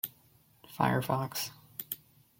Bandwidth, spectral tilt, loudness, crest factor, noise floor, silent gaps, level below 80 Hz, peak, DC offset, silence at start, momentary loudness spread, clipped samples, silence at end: 17 kHz; -5 dB/octave; -34 LUFS; 24 dB; -64 dBFS; none; -70 dBFS; -12 dBFS; under 0.1%; 0.05 s; 13 LU; under 0.1%; 0.45 s